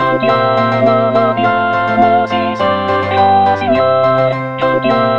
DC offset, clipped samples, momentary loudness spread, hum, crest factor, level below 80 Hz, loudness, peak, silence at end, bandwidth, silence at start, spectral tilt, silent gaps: 0.9%; under 0.1%; 4 LU; none; 12 dB; -50 dBFS; -12 LUFS; 0 dBFS; 0 s; 7 kHz; 0 s; -7.5 dB/octave; none